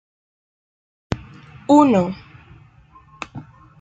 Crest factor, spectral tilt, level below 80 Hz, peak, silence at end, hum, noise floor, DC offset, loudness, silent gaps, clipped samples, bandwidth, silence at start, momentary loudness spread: 20 dB; -7 dB/octave; -50 dBFS; -2 dBFS; 0.4 s; none; -49 dBFS; under 0.1%; -18 LUFS; none; under 0.1%; 7.8 kHz; 1.1 s; 23 LU